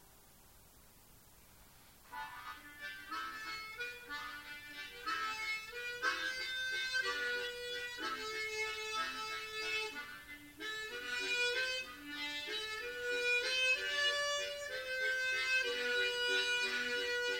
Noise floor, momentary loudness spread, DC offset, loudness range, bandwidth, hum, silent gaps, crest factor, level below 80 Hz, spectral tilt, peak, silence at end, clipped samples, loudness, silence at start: -62 dBFS; 14 LU; under 0.1%; 12 LU; 16 kHz; none; none; 16 dB; -70 dBFS; 0 dB/octave; -22 dBFS; 0 s; under 0.1%; -37 LUFS; 0 s